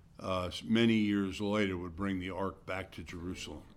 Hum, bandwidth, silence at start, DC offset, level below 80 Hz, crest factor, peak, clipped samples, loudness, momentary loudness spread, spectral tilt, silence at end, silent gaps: none; 13 kHz; 0.2 s; under 0.1%; -58 dBFS; 18 dB; -16 dBFS; under 0.1%; -34 LUFS; 14 LU; -6 dB/octave; 0.05 s; none